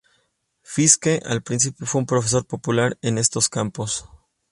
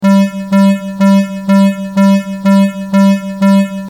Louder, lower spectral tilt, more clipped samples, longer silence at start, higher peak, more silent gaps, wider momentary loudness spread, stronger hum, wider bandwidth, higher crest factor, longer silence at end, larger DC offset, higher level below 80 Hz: second, -20 LUFS vs -11 LUFS; second, -3.5 dB/octave vs -7.5 dB/octave; neither; first, 0.7 s vs 0 s; about the same, 0 dBFS vs -2 dBFS; neither; first, 11 LU vs 2 LU; neither; second, 11.5 kHz vs 14.5 kHz; first, 22 dB vs 8 dB; first, 0.5 s vs 0 s; neither; about the same, -54 dBFS vs -52 dBFS